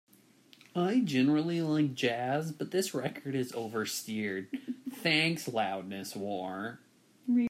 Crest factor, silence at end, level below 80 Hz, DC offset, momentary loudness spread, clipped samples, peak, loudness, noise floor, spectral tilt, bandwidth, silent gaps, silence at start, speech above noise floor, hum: 20 dB; 0 s; -78 dBFS; under 0.1%; 12 LU; under 0.1%; -12 dBFS; -32 LUFS; -61 dBFS; -5 dB/octave; 16 kHz; none; 0.75 s; 29 dB; none